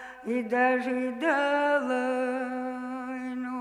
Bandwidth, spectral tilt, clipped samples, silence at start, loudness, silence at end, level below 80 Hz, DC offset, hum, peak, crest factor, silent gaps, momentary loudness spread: 11 kHz; -4.5 dB/octave; under 0.1%; 0 s; -28 LUFS; 0 s; -72 dBFS; under 0.1%; none; -12 dBFS; 16 dB; none; 10 LU